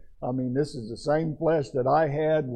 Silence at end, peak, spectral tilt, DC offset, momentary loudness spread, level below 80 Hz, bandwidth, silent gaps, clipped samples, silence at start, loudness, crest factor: 0 s; -12 dBFS; -7.5 dB/octave; under 0.1%; 8 LU; -52 dBFS; 9.6 kHz; none; under 0.1%; 0 s; -26 LUFS; 14 dB